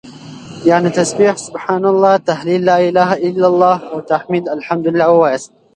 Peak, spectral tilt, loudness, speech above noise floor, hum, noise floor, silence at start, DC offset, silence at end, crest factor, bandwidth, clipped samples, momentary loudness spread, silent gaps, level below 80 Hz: 0 dBFS; -5.5 dB/octave; -14 LUFS; 20 dB; none; -33 dBFS; 0.05 s; under 0.1%; 0.3 s; 14 dB; 11.5 kHz; under 0.1%; 8 LU; none; -58 dBFS